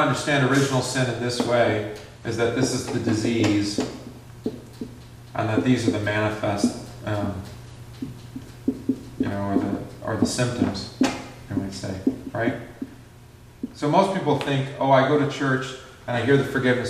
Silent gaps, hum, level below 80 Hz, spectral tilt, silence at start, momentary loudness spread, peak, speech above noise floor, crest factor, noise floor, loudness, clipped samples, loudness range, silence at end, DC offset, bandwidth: none; none; -52 dBFS; -5.5 dB/octave; 0 s; 17 LU; -4 dBFS; 24 dB; 20 dB; -47 dBFS; -24 LUFS; under 0.1%; 6 LU; 0 s; under 0.1%; 14.5 kHz